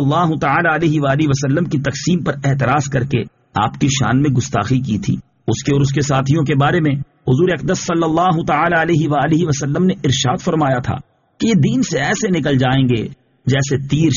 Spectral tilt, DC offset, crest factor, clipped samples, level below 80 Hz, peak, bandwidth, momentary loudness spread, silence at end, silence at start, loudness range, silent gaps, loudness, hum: -5.5 dB/octave; under 0.1%; 12 dB; under 0.1%; -42 dBFS; -2 dBFS; 7.4 kHz; 6 LU; 0 s; 0 s; 2 LU; none; -16 LUFS; none